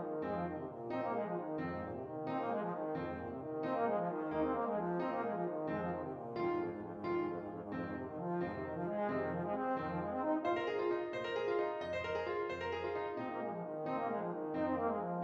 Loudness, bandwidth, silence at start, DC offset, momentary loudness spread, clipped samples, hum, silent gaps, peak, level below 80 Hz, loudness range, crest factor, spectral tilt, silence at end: -39 LUFS; 7.4 kHz; 0 s; under 0.1%; 6 LU; under 0.1%; none; none; -24 dBFS; -68 dBFS; 3 LU; 14 dB; -8 dB/octave; 0 s